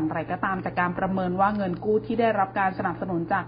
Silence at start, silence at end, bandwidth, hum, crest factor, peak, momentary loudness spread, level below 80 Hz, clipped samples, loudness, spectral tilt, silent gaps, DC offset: 0 s; 0 s; 5.2 kHz; none; 16 dB; -10 dBFS; 5 LU; -52 dBFS; under 0.1%; -25 LUFS; -11.5 dB/octave; none; under 0.1%